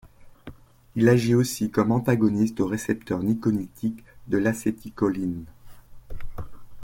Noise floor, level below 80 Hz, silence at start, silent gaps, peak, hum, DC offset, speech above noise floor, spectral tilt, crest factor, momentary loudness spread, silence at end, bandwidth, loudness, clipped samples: -46 dBFS; -46 dBFS; 0.05 s; none; -6 dBFS; none; under 0.1%; 23 dB; -7 dB/octave; 18 dB; 21 LU; 0 s; 17 kHz; -24 LUFS; under 0.1%